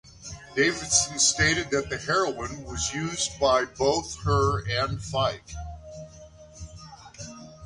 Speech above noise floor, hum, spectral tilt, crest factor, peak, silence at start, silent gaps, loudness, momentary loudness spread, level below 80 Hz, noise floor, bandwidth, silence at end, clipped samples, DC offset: 22 dB; none; -3 dB/octave; 18 dB; -8 dBFS; 0.05 s; none; -25 LUFS; 22 LU; -44 dBFS; -48 dBFS; 11.5 kHz; 0 s; under 0.1%; under 0.1%